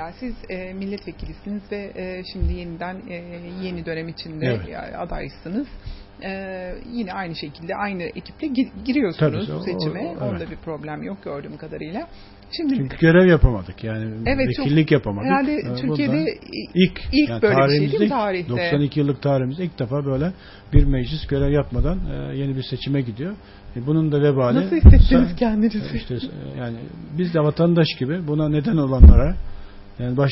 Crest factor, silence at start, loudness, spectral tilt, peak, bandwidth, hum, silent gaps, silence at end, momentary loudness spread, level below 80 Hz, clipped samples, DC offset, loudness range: 20 dB; 0 s; -21 LUFS; -11.5 dB/octave; 0 dBFS; 5.8 kHz; none; none; 0 s; 15 LU; -24 dBFS; under 0.1%; under 0.1%; 11 LU